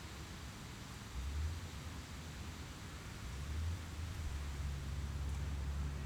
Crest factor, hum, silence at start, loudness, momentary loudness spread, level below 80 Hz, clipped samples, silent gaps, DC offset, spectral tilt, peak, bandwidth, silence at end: 12 dB; none; 0 s; -45 LUFS; 7 LU; -46 dBFS; under 0.1%; none; under 0.1%; -5 dB/octave; -30 dBFS; 17 kHz; 0 s